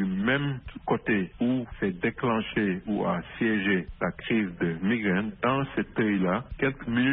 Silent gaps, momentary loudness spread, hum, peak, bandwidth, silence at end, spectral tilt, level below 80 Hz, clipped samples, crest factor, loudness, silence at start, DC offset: none; 4 LU; none; -12 dBFS; 4 kHz; 0 s; -11 dB/octave; -50 dBFS; under 0.1%; 16 dB; -28 LUFS; 0 s; under 0.1%